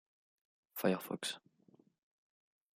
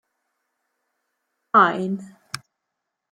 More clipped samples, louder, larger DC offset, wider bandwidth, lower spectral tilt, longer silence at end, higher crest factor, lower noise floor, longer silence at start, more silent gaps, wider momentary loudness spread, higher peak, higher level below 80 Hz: neither; second, -39 LUFS vs -19 LUFS; neither; about the same, 15.5 kHz vs 16.5 kHz; about the same, -4.5 dB/octave vs -5.5 dB/octave; first, 1.35 s vs 0.75 s; about the same, 26 dB vs 24 dB; second, -69 dBFS vs -81 dBFS; second, 0.75 s vs 1.55 s; neither; second, 14 LU vs 19 LU; second, -18 dBFS vs -2 dBFS; second, -84 dBFS vs -76 dBFS